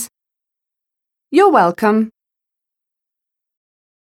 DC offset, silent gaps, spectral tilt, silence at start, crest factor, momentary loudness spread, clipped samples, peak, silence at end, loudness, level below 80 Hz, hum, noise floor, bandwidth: under 0.1%; none; -5.5 dB/octave; 0 s; 18 dB; 13 LU; under 0.1%; -2 dBFS; 2.05 s; -14 LUFS; -68 dBFS; none; -84 dBFS; 16 kHz